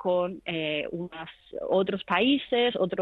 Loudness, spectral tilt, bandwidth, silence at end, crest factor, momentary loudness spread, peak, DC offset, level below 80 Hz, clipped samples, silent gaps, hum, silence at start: -27 LUFS; -7.5 dB/octave; 4.7 kHz; 0 s; 16 dB; 14 LU; -10 dBFS; under 0.1%; -64 dBFS; under 0.1%; none; none; 0 s